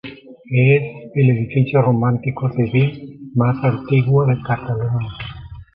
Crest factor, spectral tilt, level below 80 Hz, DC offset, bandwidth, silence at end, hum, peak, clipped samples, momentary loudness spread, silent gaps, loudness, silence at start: 14 dB; -11.5 dB/octave; -46 dBFS; under 0.1%; 4.1 kHz; 0.1 s; none; -2 dBFS; under 0.1%; 13 LU; none; -18 LUFS; 0.05 s